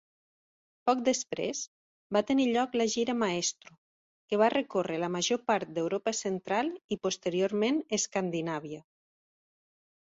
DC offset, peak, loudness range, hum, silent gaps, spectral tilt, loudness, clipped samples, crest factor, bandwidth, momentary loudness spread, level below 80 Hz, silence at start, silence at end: under 0.1%; -12 dBFS; 2 LU; none; 1.67-2.10 s, 3.78-4.28 s, 6.84-6.89 s; -3.5 dB/octave; -30 LUFS; under 0.1%; 20 dB; 8 kHz; 8 LU; -72 dBFS; 0.85 s; 1.35 s